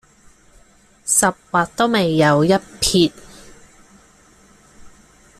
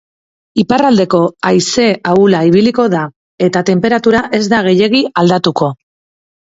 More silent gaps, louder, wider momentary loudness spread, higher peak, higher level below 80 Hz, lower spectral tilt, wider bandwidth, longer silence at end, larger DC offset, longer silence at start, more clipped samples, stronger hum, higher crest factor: second, none vs 3.16-3.38 s; second, -17 LUFS vs -11 LUFS; about the same, 6 LU vs 7 LU; about the same, -2 dBFS vs 0 dBFS; about the same, -46 dBFS vs -50 dBFS; second, -3.5 dB/octave vs -5.5 dB/octave; first, 15.5 kHz vs 8 kHz; second, 0.5 s vs 0.85 s; neither; first, 1.05 s vs 0.55 s; neither; neither; first, 20 dB vs 12 dB